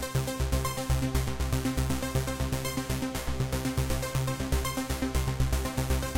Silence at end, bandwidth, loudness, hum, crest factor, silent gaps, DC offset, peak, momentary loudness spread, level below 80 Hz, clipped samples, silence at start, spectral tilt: 0 s; 17 kHz; -31 LUFS; none; 16 dB; none; under 0.1%; -12 dBFS; 2 LU; -34 dBFS; under 0.1%; 0 s; -5 dB/octave